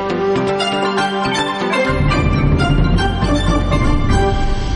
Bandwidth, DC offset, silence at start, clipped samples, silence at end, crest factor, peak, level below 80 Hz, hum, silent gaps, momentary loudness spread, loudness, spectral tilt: 11 kHz; under 0.1%; 0 s; under 0.1%; 0 s; 12 dB; -4 dBFS; -20 dBFS; none; none; 2 LU; -16 LUFS; -6 dB/octave